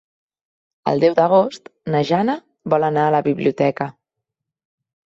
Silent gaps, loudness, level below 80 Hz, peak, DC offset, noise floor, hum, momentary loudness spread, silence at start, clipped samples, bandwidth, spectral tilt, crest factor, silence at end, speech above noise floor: none; -18 LUFS; -62 dBFS; -4 dBFS; under 0.1%; -81 dBFS; none; 12 LU; 0.85 s; under 0.1%; 7.8 kHz; -7.5 dB/octave; 16 dB; 1.15 s; 64 dB